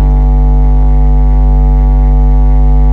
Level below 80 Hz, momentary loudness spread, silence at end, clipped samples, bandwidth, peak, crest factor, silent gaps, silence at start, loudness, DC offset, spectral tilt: -6 dBFS; 0 LU; 0 s; under 0.1%; 2.3 kHz; 0 dBFS; 4 dB; none; 0 s; -10 LUFS; under 0.1%; -11 dB/octave